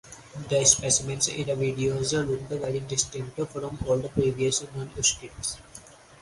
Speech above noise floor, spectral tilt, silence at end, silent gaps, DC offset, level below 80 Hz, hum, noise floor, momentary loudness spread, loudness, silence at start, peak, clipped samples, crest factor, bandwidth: 22 dB; -3 dB/octave; 0.05 s; none; under 0.1%; -50 dBFS; none; -49 dBFS; 13 LU; -26 LUFS; 0.05 s; -4 dBFS; under 0.1%; 24 dB; 11.5 kHz